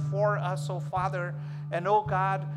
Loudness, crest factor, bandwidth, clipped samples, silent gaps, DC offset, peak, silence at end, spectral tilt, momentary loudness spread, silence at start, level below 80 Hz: -29 LUFS; 14 dB; 11.5 kHz; under 0.1%; none; under 0.1%; -14 dBFS; 0 s; -7.5 dB/octave; 8 LU; 0 s; -60 dBFS